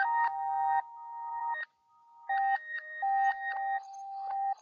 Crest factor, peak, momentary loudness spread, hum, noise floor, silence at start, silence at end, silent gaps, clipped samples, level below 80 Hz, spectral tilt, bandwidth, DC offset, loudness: 14 dB; -20 dBFS; 13 LU; none; -63 dBFS; 0 s; 0.1 s; none; under 0.1%; -90 dBFS; 5.5 dB/octave; 6.8 kHz; under 0.1%; -33 LUFS